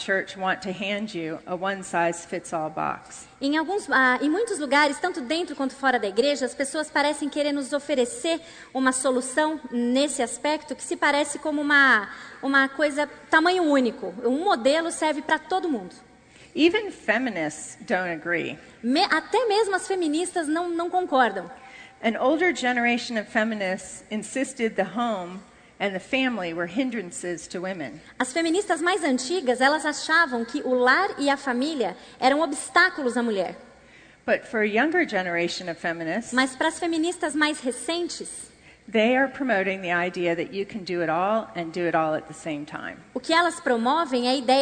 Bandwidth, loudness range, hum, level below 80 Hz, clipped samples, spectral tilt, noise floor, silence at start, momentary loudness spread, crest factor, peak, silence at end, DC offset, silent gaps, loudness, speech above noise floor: 9.6 kHz; 5 LU; none; -64 dBFS; under 0.1%; -3 dB/octave; -52 dBFS; 0 s; 11 LU; 20 dB; -6 dBFS; 0 s; under 0.1%; none; -24 LUFS; 27 dB